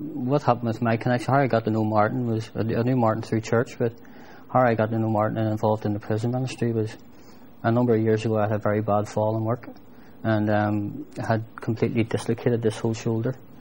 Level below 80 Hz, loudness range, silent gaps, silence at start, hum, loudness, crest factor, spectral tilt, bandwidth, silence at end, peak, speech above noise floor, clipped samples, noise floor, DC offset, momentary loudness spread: -58 dBFS; 3 LU; none; 0 s; none; -24 LUFS; 20 dB; -7.5 dB/octave; 16 kHz; 0.25 s; -4 dBFS; 25 dB; under 0.1%; -49 dBFS; 0.5%; 7 LU